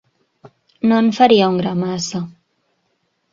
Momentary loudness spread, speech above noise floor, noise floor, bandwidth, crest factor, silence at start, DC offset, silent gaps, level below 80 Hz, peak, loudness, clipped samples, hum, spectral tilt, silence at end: 13 LU; 53 dB; -67 dBFS; 7.8 kHz; 18 dB; 0.45 s; under 0.1%; none; -58 dBFS; 0 dBFS; -16 LUFS; under 0.1%; none; -5.5 dB/octave; 1 s